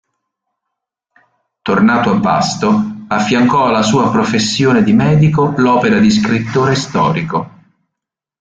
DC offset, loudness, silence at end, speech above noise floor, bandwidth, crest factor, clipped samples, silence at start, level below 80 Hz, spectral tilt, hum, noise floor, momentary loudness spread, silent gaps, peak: under 0.1%; -12 LUFS; 0.9 s; 70 dB; 9.2 kHz; 12 dB; under 0.1%; 1.65 s; -46 dBFS; -5.5 dB/octave; none; -81 dBFS; 7 LU; none; -2 dBFS